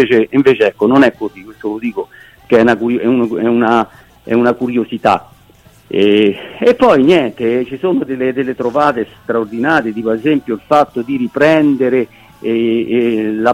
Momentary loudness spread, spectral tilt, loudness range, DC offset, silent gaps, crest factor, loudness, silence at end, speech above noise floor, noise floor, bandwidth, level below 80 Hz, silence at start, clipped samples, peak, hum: 10 LU; -7 dB/octave; 2 LU; under 0.1%; none; 14 dB; -13 LUFS; 0 s; 32 dB; -45 dBFS; 14.5 kHz; -50 dBFS; 0 s; under 0.1%; 0 dBFS; none